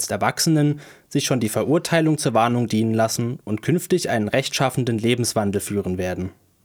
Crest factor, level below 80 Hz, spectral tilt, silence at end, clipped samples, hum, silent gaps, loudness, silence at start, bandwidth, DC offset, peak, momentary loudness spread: 18 dB; -56 dBFS; -5 dB/octave; 0.35 s; under 0.1%; none; none; -21 LUFS; 0 s; over 20 kHz; under 0.1%; -4 dBFS; 7 LU